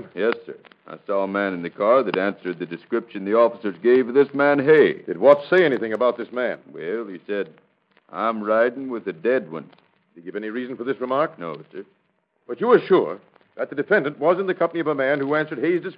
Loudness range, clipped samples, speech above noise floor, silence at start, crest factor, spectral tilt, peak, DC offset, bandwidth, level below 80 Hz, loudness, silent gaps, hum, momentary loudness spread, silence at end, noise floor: 8 LU; under 0.1%; 47 dB; 0 s; 22 dB; -8.5 dB/octave; 0 dBFS; under 0.1%; 5.2 kHz; -76 dBFS; -21 LUFS; none; none; 18 LU; 0.05 s; -68 dBFS